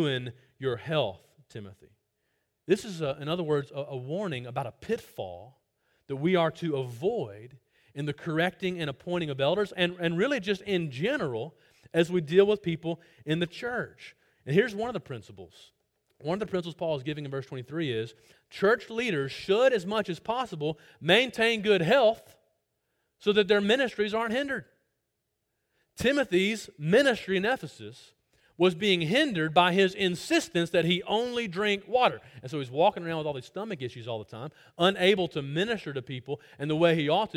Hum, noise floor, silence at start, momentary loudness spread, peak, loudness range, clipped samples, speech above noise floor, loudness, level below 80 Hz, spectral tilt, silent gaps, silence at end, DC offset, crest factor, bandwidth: none; -81 dBFS; 0 s; 14 LU; -8 dBFS; 7 LU; under 0.1%; 53 dB; -28 LUFS; -64 dBFS; -5.5 dB/octave; none; 0.1 s; under 0.1%; 22 dB; 16.5 kHz